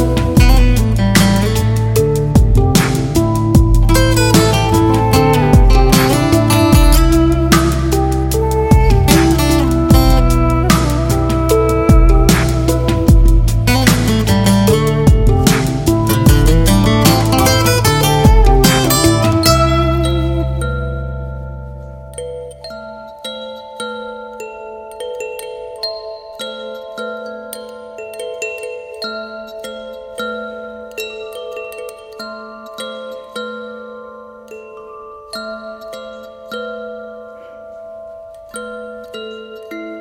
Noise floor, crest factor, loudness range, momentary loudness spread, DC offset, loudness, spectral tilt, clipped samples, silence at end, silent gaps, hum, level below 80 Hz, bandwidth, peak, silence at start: -34 dBFS; 14 dB; 18 LU; 20 LU; under 0.1%; -12 LUFS; -5.5 dB/octave; under 0.1%; 0 s; none; none; -18 dBFS; 17 kHz; 0 dBFS; 0 s